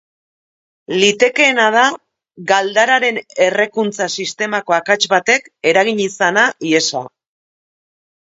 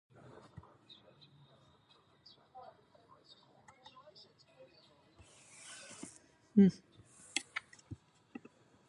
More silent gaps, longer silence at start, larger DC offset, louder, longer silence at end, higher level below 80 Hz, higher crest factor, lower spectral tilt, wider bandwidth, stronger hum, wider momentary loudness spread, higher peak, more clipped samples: neither; second, 0.9 s vs 6.55 s; neither; first, -14 LUFS vs -34 LUFS; first, 1.3 s vs 0.95 s; first, -66 dBFS vs -74 dBFS; second, 16 dB vs 26 dB; second, -2.5 dB/octave vs -6 dB/octave; second, 8 kHz vs 11.5 kHz; neither; second, 8 LU vs 30 LU; first, 0 dBFS vs -16 dBFS; neither